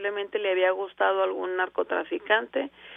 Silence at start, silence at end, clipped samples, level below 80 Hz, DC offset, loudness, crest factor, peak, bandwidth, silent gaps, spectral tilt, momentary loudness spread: 0 s; 0 s; under 0.1%; -74 dBFS; under 0.1%; -27 LUFS; 18 dB; -10 dBFS; 3.8 kHz; none; -5.5 dB/octave; 6 LU